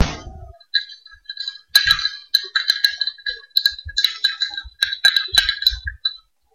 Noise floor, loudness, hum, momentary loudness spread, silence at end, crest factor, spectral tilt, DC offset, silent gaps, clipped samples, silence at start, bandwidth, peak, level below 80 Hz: -39 dBFS; -18 LUFS; none; 14 LU; 0.4 s; 20 dB; -0.5 dB/octave; under 0.1%; none; under 0.1%; 0 s; 16 kHz; 0 dBFS; -40 dBFS